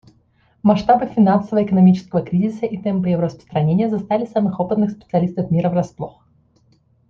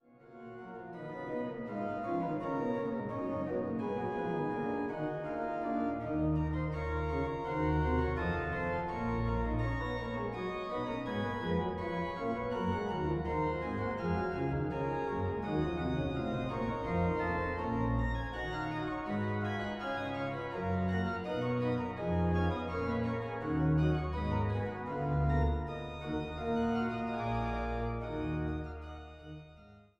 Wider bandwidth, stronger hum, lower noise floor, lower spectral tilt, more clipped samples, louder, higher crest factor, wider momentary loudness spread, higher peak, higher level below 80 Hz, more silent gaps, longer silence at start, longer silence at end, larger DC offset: second, 6.6 kHz vs 7.8 kHz; neither; about the same, -58 dBFS vs -57 dBFS; about the same, -9.5 dB/octave vs -8.5 dB/octave; neither; first, -18 LUFS vs -35 LUFS; about the same, 16 dB vs 14 dB; about the same, 8 LU vs 6 LU; first, -2 dBFS vs -20 dBFS; second, -52 dBFS vs -44 dBFS; neither; first, 0.65 s vs 0.25 s; first, 1 s vs 0.2 s; neither